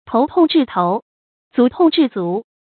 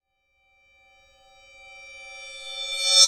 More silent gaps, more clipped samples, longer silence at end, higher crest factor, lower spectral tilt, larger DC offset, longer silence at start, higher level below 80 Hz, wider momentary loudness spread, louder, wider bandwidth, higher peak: first, 1.02-1.51 s vs none; neither; first, 0.2 s vs 0 s; second, 14 dB vs 26 dB; first, -11.5 dB/octave vs 5.5 dB/octave; neither; second, 0.1 s vs 1.85 s; first, -58 dBFS vs -68 dBFS; second, 9 LU vs 24 LU; first, -16 LUFS vs -26 LUFS; second, 4.5 kHz vs 16 kHz; about the same, -2 dBFS vs -2 dBFS